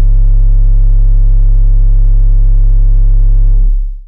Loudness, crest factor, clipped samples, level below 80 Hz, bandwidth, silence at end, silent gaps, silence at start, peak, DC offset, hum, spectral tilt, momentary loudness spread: -12 LUFS; 2 dB; under 0.1%; -6 dBFS; 0.8 kHz; 0.05 s; none; 0 s; -4 dBFS; 0.4%; none; -11 dB/octave; 0 LU